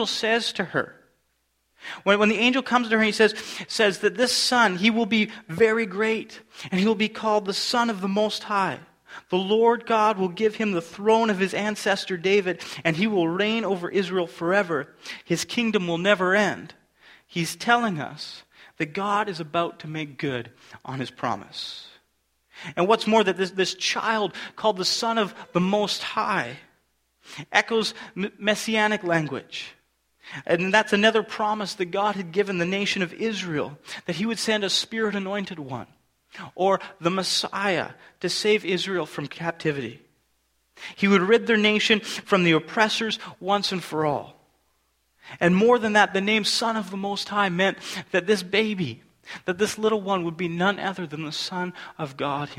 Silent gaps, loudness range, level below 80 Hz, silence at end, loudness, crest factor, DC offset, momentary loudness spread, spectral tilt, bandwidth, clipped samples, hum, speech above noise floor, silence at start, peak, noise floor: none; 5 LU; -66 dBFS; 0 s; -23 LUFS; 22 dB; under 0.1%; 14 LU; -4 dB/octave; 16 kHz; under 0.1%; none; 47 dB; 0 s; -2 dBFS; -71 dBFS